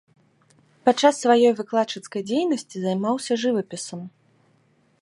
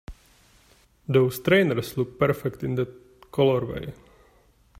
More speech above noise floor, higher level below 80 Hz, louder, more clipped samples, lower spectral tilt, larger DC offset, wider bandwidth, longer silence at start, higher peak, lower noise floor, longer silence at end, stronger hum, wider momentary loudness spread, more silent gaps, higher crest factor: first, 41 dB vs 36 dB; second, -76 dBFS vs -52 dBFS; about the same, -22 LUFS vs -24 LUFS; neither; second, -4.5 dB/octave vs -6.5 dB/octave; neither; second, 11.5 kHz vs 16 kHz; first, 0.85 s vs 0.1 s; first, -4 dBFS vs -8 dBFS; about the same, -62 dBFS vs -59 dBFS; about the same, 0.95 s vs 0.85 s; neither; about the same, 15 LU vs 13 LU; neither; about the same, 20 dB vs 18 dB